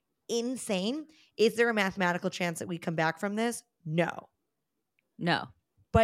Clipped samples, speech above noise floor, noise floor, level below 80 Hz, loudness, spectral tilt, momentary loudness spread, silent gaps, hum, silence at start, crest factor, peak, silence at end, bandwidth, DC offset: under 0.1%; 54 dB; -85 dBFS; -54 dBFS; -31 LUFS; -5 dB/octave; 10 LU; none; none; 0.3 s; 20 dB; -10 dBFS; 0 s; 16 kHz; under 0.1%